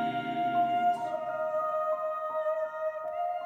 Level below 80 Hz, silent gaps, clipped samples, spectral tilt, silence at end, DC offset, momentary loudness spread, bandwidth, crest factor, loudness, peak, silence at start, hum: -78 dBFS; none; under 0.1%; -6 dB/octave; 0 s; under 0.1%; 6 LU; 17 kHz; 12 dB; -31 LUFS; -18 dBFS; 0 s; none